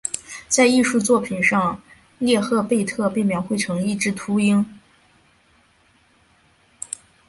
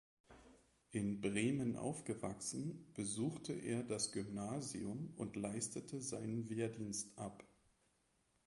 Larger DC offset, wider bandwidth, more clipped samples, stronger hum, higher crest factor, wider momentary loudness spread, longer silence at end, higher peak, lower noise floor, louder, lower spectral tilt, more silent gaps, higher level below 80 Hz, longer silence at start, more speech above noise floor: neither; about the same, 11.5 kHz vs 11.5 kHz; neither; neither; about the same, 18 dB vs 20 dB; first, 15 LU vs 7 LU; first, 2.5 s vs 1 s; first, -4 dBFS vs -26 dBFS; second, -58 dBFS vs -80 dBFS; first, -20 LUFS vs -44 LUFS; about the same, -4.5 dB/octave vs -4.5 dB/octave; neither; first, -58 dBFS vs -72 dBFS; second, 0.05 s vs 0.3 s; about the same, 39 dB vs 36 dB